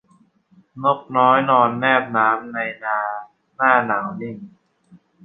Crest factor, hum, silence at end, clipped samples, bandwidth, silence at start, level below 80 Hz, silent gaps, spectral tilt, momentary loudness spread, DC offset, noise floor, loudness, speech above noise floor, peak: 18 dB; none; 0.3 s; under 0.1%; 4 kHz; 0.75 s; -70 dBFS; none; -8 dB/octave; 14 LU; under 0.1%; -57 dBFS; -18 LUFS; 39 dB; -2 dBFS